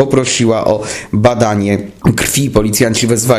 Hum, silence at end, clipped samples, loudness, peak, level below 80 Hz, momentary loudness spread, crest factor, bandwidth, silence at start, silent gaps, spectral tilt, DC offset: none; 0 s; 0.3%; -12 LUFS; 0 dBFS; -34 dBFS; 4 LU; 12 dB; 16 kHz; 0 s; none; -4.5 dB/octave; under 0.1%